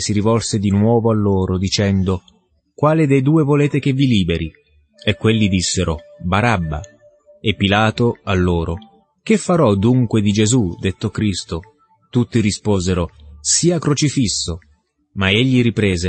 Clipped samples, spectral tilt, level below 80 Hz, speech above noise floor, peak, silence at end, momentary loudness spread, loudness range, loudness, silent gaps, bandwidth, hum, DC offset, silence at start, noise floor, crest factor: under 0.1%; -5 dB/octave; -38 dBFS; 35 dB; -2 dBFS; 0 s; 10 LU; 2 LU; -17 LUFS; none; 8.8 kHz; none; under 0.1%; 0 s; -51 dBFS; 16 dB